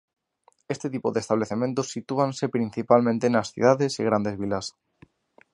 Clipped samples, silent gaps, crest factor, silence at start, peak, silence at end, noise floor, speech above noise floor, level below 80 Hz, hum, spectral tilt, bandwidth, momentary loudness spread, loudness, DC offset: under 0.1%; none; 22 dB; 0.7 s; -4 dBFS; 0.85 s; -64 dBFS; 40 dB; -62 dBFS; none; -6 dB/octave; 11 kHz; 10 LU; -25 LUFS; under 0.1%